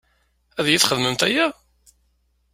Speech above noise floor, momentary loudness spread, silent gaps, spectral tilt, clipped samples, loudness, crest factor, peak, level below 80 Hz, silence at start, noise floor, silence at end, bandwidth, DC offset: 46 dB; 8 LU; none; -2.5 dB/octave; under 0.1%; -19 LUFS; 24 dB; 0 dBFS; -58 dBFS; 0.55 s; -66 dBFS; 1 s; 16 kHz; under 0.1%